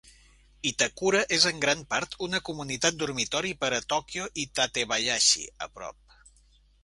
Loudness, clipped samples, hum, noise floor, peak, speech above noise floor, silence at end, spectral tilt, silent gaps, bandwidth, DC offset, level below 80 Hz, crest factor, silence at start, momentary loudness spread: -26 LUFS; under 0.1%; none; -61 dBFS; -6 dBFS; 33 dB; 0.9 s; -1.5 dB/octave; none; 11.5 kHz; under 0.1%; -58 dBFS; 24 dB; 0.65 s; 12 LU